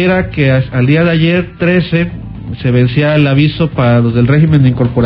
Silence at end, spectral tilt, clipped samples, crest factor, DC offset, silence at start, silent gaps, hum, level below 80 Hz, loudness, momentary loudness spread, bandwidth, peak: 0 s; -10 dB/octave; under 0.1%; 10 dB; under 0.1%; 0 s; none; none; -32 dBFS; -11 LUFS; 6 LU; 5.4 kHz; 0 dBFS